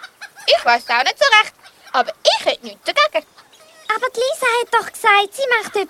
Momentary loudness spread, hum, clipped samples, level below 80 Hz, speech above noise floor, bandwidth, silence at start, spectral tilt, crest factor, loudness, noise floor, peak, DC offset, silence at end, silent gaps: 10 LU; none; under 0.1%; -66 dBFS; 29 dB; 16.5 kHz; 0 s; 0.5 dB/octave; 18 dB; -16 LUFS; -46 dBFS; 0 dBFS; under 0.1%; 0.05 s; none